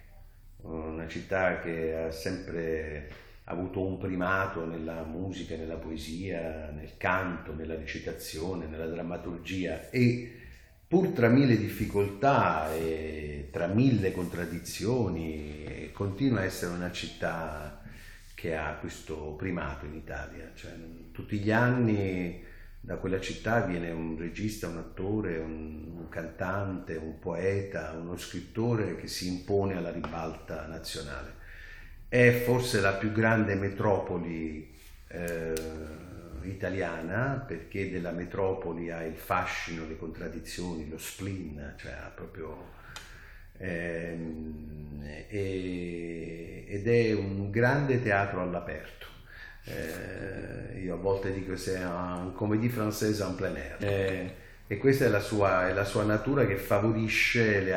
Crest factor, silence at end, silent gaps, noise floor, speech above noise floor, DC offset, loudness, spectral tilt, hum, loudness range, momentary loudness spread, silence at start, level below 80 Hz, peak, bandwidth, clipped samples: 22 dB; 0 s; none; -52 dBFS; 21 dB; under 0.1%; -31 LUFS; -6 dB/octave; none; 9 LU; 17 LU; 0 s; -48 dBFS; -8 dBFS; 19 kHz; under 0.1%